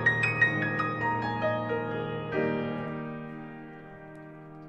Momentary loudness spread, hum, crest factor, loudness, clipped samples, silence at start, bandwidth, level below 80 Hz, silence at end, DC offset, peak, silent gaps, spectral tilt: 21 LU; none; 20 dB; -29 LUFS; under 0.1%; 0 s; 8.4 kHz; -60 dBFS; 0 s; under 0.1%; -10 dBFS; none; -7 dB/octave